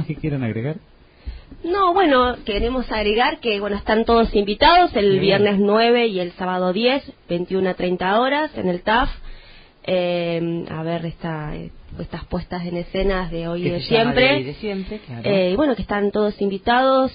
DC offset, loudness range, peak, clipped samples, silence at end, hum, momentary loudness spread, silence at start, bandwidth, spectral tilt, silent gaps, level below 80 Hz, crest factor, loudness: under 0.1%; 9 LU; -2 dBFS; under 0.1%; 0 s; none; 13 LU; 0 s; 5.2 kHz; -11 dB/octave; none; -38 dBFS; 18 dB; -19 LUFS